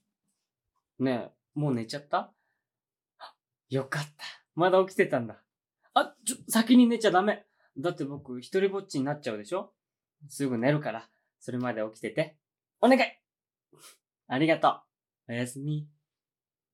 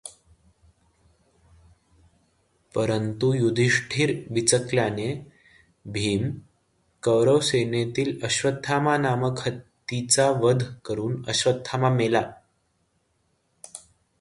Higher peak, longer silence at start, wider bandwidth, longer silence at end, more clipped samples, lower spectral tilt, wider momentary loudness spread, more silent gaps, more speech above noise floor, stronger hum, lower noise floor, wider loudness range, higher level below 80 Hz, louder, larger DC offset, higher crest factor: about the same, -8 dBFS vs -6 dBFS; first, 1 s vs 0.05 s; first, 16.5 kHz vs 11.5 kHz; first, 0.85 s vs 0.4 s; neither; about the same, -5 dB/octave vs -4.5 dB/octave; first, 17 LU vs 13 LU; neither; first, over 62 dB vs 47 dB; neither; first, under -90 dBFS vs -70 dBFS; first, 8 LU vs 3 LU; second, -88 dBFS vs -58 dBFS; second, -28 LUFS vs -24 LUFS; neither; about the same, 22 dB vs 20 dB